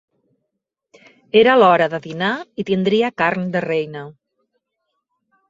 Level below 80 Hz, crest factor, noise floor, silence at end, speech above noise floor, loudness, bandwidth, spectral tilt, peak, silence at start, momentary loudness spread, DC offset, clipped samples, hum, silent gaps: -62 dBFS; 18 dB; -78 dBFS; 1.4 s; 61 dB; -17 LUFS; 7.6 kHz; -6.5 dB/octave; 0 dBFS; 1.35 s; 14 LU; under 0.1%; under 0.1%; none; none